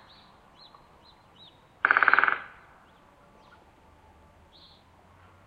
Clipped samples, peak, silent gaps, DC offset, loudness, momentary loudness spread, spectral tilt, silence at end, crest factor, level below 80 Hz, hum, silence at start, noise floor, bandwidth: under 0.1%; -4 dBFS; none; under 0.1%; -23 LUFS; 15 LU; -4 dB/octave; 3 s; 28 dB; -66 dBFS; none; 1.85 s; -57 dBFS; 7 kHz